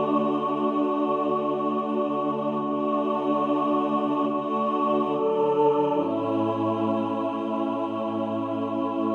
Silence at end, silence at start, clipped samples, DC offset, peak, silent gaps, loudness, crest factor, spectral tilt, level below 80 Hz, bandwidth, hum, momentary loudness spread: 0 s; 0 s; under 0.1%; under 0.1%; -12 dBFS; none; -25 LUFS; 14 dB; -8.5 dB/octave; -74 dBFS; 6.6 kHz; none; 4 LU